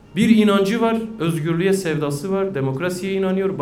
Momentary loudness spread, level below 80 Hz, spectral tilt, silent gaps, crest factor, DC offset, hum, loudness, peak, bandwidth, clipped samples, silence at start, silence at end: 8 LU; -52 dBFS; -6.5 dB/octave; none; 18 dB; under 0.1%; none; -19 LUFS; -2 dBFS; 16 kHz; under 0.1%; 0.1 s; 0 s